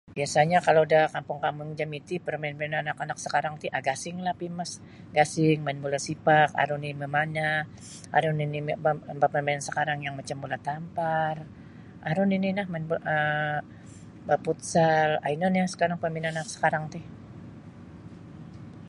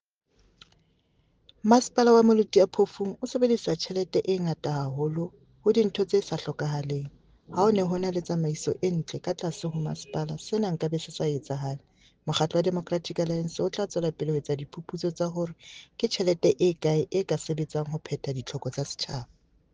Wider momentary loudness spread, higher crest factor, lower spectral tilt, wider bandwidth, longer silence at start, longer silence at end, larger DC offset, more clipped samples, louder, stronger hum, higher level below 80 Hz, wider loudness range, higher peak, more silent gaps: first, 22 LU vs 11 LU; about the same, 20 dB vs 22 dB; about the same, -5 dB/octave vs -6 dB/octave; first, 11.5 kHz vs 9.8 kHz; second, 0.05 s vs 1.65 s; second, 0 s vs 0.5 s; neither; neither; about the same, -27 LUFS vs -27 LUFS; neither; about the same, -62 dBFS vs -62 dBFS; second, 4 LU vs 7 LU; about the same, -6 dBFS vs -6 dBFS; neither